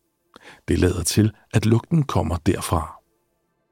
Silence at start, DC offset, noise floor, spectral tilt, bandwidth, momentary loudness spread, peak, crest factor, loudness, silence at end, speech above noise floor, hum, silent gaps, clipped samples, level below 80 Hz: 0.45 s; under 0.1%; -70 dBFS; -6 dB/octave; 16.5 kHz; 6 LU; -4 dBFS; 18 dB; -21 LUFS; 0.75 s; 50 dB; none; none; under 0.1%; -38 dBFS